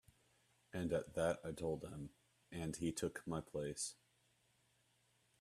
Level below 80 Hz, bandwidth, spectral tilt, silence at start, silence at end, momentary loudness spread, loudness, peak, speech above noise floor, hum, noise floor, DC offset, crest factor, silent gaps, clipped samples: -68 dBFS; 14 kHz; -5 dB/octave; 0.75 s; 1.5 s; 11 LU; -44 LUFS; -24 dBFS; 35 dB; none; -78 dBFS; under 0.1%; 22 dB; none; under 0.1%